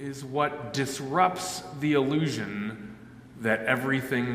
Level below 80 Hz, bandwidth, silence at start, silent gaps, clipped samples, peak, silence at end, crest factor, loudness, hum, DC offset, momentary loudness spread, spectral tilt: -62 dBFS; 16 kHz; 0 s; none; under 0.1%; -8 dBFS; 0 s; 20 dB; -28 LUFS; none; under 0.1%; 13 LU; -5 dB/octave